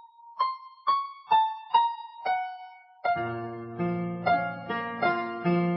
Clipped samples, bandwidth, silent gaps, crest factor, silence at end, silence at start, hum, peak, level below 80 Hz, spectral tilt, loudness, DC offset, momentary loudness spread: under 0.1%; 5.8 kHz; none; 18 dB; 0 s; 0.05 s; none; -10 dBFS; -66 dBFS; -10 dB/octave; -29 LUFS; under 0.1%; 11 LU